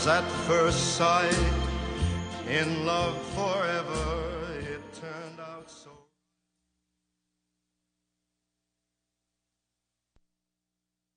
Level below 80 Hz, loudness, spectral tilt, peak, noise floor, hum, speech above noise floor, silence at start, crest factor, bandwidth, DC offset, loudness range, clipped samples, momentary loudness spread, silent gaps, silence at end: -42 dBFS; -28 LUFS; -4 dB/octave; -10 dBFS; -86 dBFS; 60 Hz at -65 dBFS; 60 dB; 0 s; 22 dB; 10 kHz; under 0.1%; 19 LU; under 0.1%; 17 LU; none; 5.2 s